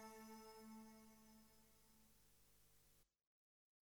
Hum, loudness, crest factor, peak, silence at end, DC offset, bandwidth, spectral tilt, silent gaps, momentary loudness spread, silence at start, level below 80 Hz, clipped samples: 50 Hz at -80 dBFS; -63 LUFS; 18 dB; -48 dBFS; 0.55 s; under 0.1%; over 20 kHz; -3.5 dB/octave; none; 9 LU; 0 s; -84 dBFS; under 0.1%